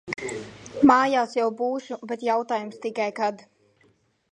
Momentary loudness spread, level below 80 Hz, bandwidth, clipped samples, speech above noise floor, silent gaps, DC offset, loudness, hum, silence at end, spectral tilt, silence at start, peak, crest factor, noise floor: 15 LU; -64 dBFS; 10.5 kHz; under 0.1%; 39 dB; none; under 0.1%; -24 LUFS; none; 0.95 s; -5 dB/octave; 0.05 s; -4 dBFS; 22 dB; -64 dBFS